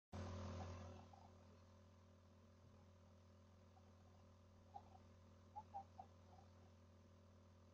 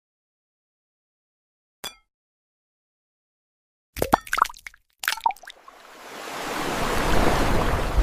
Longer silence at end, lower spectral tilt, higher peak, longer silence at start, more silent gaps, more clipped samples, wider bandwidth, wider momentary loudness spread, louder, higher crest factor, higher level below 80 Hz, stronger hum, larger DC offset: about the same, 0 s vs 0 s; first, -6.5 dB/octave vs -4 dB/octave; second, -42 dBFS vs 0 dBFS; second, 0.1 s vs 1.85 s; second, none vs 2.14-3.93 s; neither; second, 7.4 kHz vs 16 kHz; second, 15 LU vs 21 LU; second, -62 LUFS vs -25 LUFS; second, 20 dB vs 26 dB; second, -80 dBFS vs -34 dBFS; neither; neither